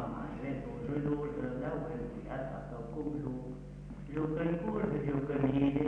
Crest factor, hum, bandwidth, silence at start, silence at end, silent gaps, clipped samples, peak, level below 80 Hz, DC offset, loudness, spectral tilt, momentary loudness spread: 18 dB; none; 8 kHz; 0 s; 0 s; none; under 0.1%; -18 dBFS; -50 dBFS; under 0.1%; -36 LUFS; -9.5 dB/octave; 10 LU